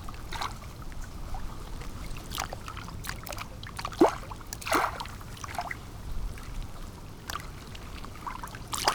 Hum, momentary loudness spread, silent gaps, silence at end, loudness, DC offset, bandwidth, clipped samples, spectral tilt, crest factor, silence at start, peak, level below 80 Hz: none; 15 LU; none; 0 s; -35 LUFS; under 0.1%; over 20 kHz; under 0.1%; -4 dB/octave; 28 dB; 0 s; -6 dBFS; -42 dBFS